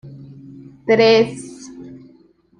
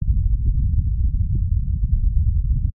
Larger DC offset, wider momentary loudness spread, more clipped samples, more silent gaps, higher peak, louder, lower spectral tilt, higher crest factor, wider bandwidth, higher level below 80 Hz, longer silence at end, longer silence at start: neither; first, 27 LU vs 2 LU; neither; neither; first, -2 dBFS vs -6 dBFS; first, -15 LUFS vs -22 LUFS; second, -5 dB/octave vs -19.5 dB/octave; first, 18 dB vs 12 dB; first, 10 kHz vs 0.4 kHz; second, -60 dBFS vs -20 dBFS; first, 0.65 s vs 0.05 s; about the same, 0.05 s vs 0 s